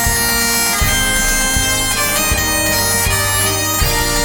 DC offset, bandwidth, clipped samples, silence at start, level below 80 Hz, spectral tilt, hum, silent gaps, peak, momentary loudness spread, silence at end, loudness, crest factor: under 0.1%; 18 kHz; under 0.1%; 0 s; -24 dBFS; -2 dB/octave; none; none; 0 dBFS; 1 LU; 0 s; -13 LUFS; 14 dB